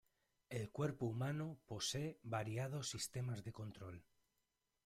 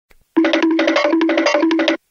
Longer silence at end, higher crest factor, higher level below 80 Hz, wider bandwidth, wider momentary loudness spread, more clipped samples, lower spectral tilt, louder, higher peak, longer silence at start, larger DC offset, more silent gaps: first, 0.85 s vs 0.15 s; about the same, 18 dB vs 16 dB; second, -74 dBFS vs -62 dBFS; first, 15.5 kHz vs 7.2 kHz; first, 10 LU vs 3 LU; neither; first, -4.5 dB/octave vs -2.5 dB/octave; second, -45 LUFS vs -16 LUFS; second, -28 dBFS vs 0 dBFS; first, 0.5 s vs 0.35 s; neither; neither